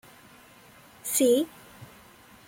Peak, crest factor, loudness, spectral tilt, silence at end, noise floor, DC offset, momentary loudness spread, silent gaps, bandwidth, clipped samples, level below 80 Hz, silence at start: -10 dBFS; 20 dB; -25 LUFS; -3 dB/octave; 0.6 s; -53 dBFS; under 0.1%; 26 LU; none; 16.5 kHz; under 0.1%; -68 dBFS; 1.05 s